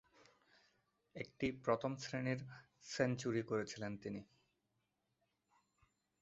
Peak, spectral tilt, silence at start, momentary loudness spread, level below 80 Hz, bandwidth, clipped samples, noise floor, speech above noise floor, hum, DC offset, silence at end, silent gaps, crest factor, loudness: -22 dBFS; -5.5 dB/octave; 1.15 s; 13 LU; -74 dBFS; 8 kHz; under 0.1%; -86 dBFS; 44 dB; none; under 0.1%; 2 s; none; 24 dB; -42 LUFS